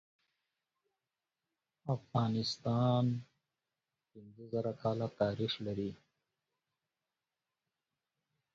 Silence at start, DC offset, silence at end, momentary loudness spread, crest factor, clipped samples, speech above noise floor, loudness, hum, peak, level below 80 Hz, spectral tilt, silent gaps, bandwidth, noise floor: 1.85 s; under 0.1%; 2.6 s; 11 LU; 20 dB; under 0.1%; over 55 dB; -36 LUFS; none; -18 dBFS; -70 dBFS; -6.5 dB/octave; none; 7.6 kHz; under -90 dBFS